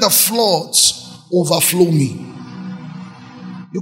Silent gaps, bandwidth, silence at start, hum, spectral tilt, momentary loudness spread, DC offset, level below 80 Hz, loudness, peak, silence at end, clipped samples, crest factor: none; 16.5 kHz; 0 s; none; -3.5 dB/octave; 22 LU; under 0.1%; -58 dBFS; -14 LUFS; 0 dBFS; 0 s; under 0.1%; 16 dB